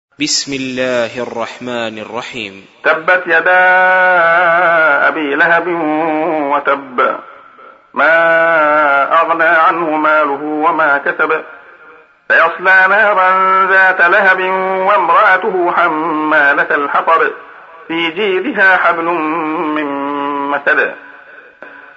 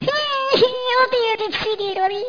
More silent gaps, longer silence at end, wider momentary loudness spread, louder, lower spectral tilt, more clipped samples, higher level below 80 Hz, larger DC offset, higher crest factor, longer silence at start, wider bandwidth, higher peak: neither; first, 0.15 s vs 0 s; first, 11 LU vs 5 LU; first, -11 LUFS vs -19 LUFS; about the same, -3 dB/octave vs -4 dB/octave; neither; second, -64 dBFS vs -56 dBFS; neither; about the same, 12 dB vs 16 dB; first, 0.2 s vs 0 s; first, 8 kHz vs 5.2 kHz; first, 0 dBFS vs -4 dBFS